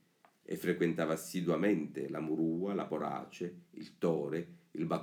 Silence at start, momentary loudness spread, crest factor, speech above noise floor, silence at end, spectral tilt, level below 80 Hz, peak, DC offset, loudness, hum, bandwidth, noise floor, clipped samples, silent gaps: 0.5 s; 12 LU; 18 dB; 23 dB; 0 s; -6.5 dB/octave; -76 dBFS; -18 dBFS; under 0.1%; -36 LUFS; none; 18 kHz; -59 dBFS; under 0.1%; none